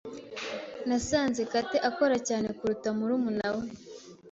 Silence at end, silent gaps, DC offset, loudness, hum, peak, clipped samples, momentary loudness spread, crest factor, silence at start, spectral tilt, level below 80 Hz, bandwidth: 0 s; none; under 0.1%; -30 LUFS; none; -12 dBFS; under 0.1%; 14 LU; 18 dB; 0.05 s; -4 dB/octave; -58 dBFS; 8 kHz